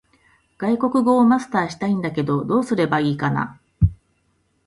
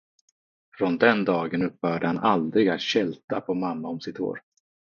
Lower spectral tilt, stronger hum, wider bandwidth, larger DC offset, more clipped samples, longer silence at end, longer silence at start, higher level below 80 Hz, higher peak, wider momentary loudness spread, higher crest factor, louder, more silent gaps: first, -7.5 dB/octave vs -6 dB/octave; neither; first, 11.5 kHz vs 7 kHz; neither; neither; first, 0.75 s vs 0.45 s; second, 0.6 s vs 0.75 s; first, -36 dBFS vs -68 dBFS; about the same, -4 dBFS vs -4 dBFS; second, 7 LU vs 11 LU; second, 16 dB vs 22 dB; first, -20 LUFS vs -25 LUFS; second, none vs 3.24-3.28 s